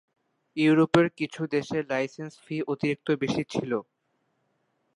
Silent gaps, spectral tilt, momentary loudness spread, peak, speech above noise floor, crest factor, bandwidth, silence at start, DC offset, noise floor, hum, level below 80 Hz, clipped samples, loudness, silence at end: none; -6.5 dB/octave; 12 LU; -6 dBFS; 48 dB; 22 dB; 11 kHz; 0.55 s; under 0.1%; -74 dBFS; none; -66 dBFS; under 0.1%; -27 LUFS; 1.15 s